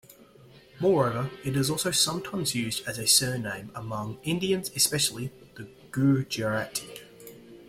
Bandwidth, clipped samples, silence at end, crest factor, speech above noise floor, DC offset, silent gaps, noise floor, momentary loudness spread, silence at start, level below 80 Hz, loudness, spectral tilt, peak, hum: 16.5 kHz; under 0.1%; 0 s; 22 dB; 26 dB; under 0.1%; none; -53 dBFS; 22 LU; 0.1 s; -60 dBFS; -26 LUFS; -3.5 dB/octave; -8 dBFS; none